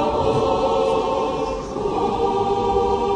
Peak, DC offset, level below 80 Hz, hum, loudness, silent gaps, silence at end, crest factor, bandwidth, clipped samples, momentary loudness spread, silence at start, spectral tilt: -6 dBFS; under 0.1%; -38 dBFS; none; -21 LUFS; none; 0 s; 14 dB; 10 kHz; under 0.1%; 5 LU; 0 s; -6 dB/octave